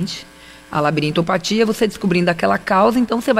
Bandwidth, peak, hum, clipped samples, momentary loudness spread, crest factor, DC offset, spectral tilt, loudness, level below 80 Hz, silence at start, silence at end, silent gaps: 16 kHz; -4 dBFS; none; under 0.1%; 7 LU; 14 dB; under 0.1%; -5.5 dB/octave; -17 LUFS; -48 dBFS; 0 s; 0 s; none